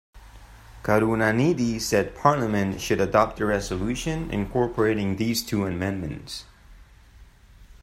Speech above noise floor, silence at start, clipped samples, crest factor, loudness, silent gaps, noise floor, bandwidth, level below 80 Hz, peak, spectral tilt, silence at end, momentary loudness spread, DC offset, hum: 27 dB; 0.15 s; under 0.1%; 22 dB; -24 LUFS; none; -50 dBFS; 16 kHz; -44 dBFS; -4 dBFS; -5.5 dB/octave; 0.05 s; 8 LU; under 0.1%; none